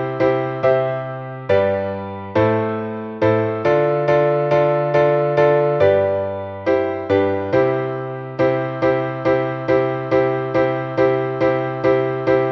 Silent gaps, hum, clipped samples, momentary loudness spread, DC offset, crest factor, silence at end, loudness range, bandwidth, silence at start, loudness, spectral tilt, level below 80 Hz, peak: none; none; under 0.1%; 8 LU; under 0.1%; 16 dB; 0 s; 3 LU; 6.6 kHz; 0 s; -18 LUFS; -8.5 dB/octave; -52 dBFS; -2 dBFS